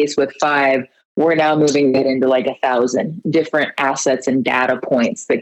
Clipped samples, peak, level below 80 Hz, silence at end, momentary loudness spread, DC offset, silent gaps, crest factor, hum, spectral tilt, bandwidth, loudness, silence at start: under 0.1%; -2 dBFS; -64 dBFS; 0 s; 5 LU; under 0.1%; 1.05-1.15 s; 14 dB; none; -4.5 dB/octave; 9 kHz; -16 LUFS; 0 s